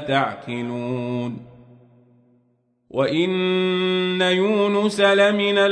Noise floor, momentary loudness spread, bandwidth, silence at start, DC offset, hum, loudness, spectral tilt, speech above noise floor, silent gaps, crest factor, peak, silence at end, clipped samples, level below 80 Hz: -65 dBFS; 11 LU; 11 kHz; 0 s; under 0.1%; none; -20 LUFS; -5.5 dB/octave; 45 dB; none; 18 dB; -4 dBFS; 0 s; under 0.1%; -66 dBFS